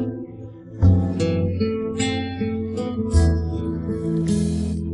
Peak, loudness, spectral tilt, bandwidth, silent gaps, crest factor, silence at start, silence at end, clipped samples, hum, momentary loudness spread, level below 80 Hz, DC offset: -4 dBFS; -22 LUFS; -7 dB/octave; 11.5 kHz; none; 16 dB; 0 s; 0 s; under 0.1%; none; 9 LU; -34 dBFS; under 0.1%